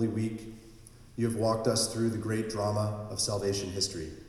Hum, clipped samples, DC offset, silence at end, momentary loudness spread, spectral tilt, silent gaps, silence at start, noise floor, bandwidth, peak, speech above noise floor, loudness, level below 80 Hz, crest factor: none; under 0.1%; under 0.1%; 0 s; 11 LU; -4.5 dB/octave; none; 0 s; -52 dBFS; 15.5 kHz; -14 dBFS; 21 dB; -31 LUFS; -56 dBFS; 18 dB